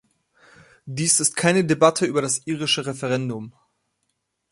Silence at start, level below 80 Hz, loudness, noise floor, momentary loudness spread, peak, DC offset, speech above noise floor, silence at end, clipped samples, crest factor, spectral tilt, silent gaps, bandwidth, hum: 0.85 s; -64 dBFS; -20 LUFS; -75 dBFS; 14 LU; -2 dBFS; under 0.1%; 54 dB; 1 s; under 0.1%; 22 dB; -3.5 dB/octave; none; 12 kHz; none